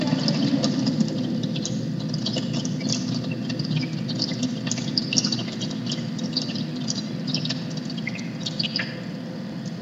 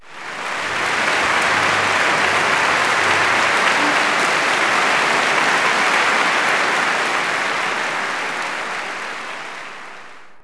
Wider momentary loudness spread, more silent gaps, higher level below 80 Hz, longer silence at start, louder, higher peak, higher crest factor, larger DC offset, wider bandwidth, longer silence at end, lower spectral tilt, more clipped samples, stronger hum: second, 7 LU vs 12 LU; neither; about the same, -62 dBFS vs -58 dBFS; about the same, 0 s vs 0 s; second, -26 LUFS vs -16 LUFS; about the same, -2 dBFS vs -4 dBFS; first, 24 dB vs 16 dB; neither; second, 8 kHz vs 11 kHz; about the same, 0 s vs 0.05 s; first, -4.5 dB/octave vs -1.5 dB/octave; neither; neither